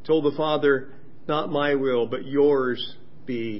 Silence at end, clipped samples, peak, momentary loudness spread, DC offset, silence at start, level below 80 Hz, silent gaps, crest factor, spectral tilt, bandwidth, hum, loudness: 0 s; under 0.1%; -8 dBFS; 12 LU; 2%; 0.05 s; -66 dBFS; none; 16 dB; -10.5 dB/octave; 5.8 kHz; none; -24 LUFS